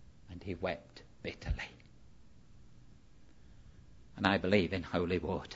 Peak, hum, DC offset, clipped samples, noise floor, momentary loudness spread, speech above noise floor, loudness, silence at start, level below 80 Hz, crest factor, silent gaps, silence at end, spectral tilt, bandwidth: -10 dBFS; none; under 0.1%; under 0.1%; -61 dBFS; 18 LU; 27 dB; -35 LUFS; 0.05 s; -52 dBFS; 28 dB; none; 0 s; -4.5 dB/octave; 7.6 kHz